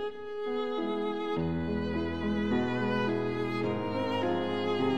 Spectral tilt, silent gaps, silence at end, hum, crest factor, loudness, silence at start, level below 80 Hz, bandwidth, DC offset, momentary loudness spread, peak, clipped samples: -7.5 dB/octave; none; 0 s; none; 12 dB; -31 LUFS; 0 s; -56 dBFS; 9 kHz; 0.4%; 3 LU; -18 dBFS; under 0.1%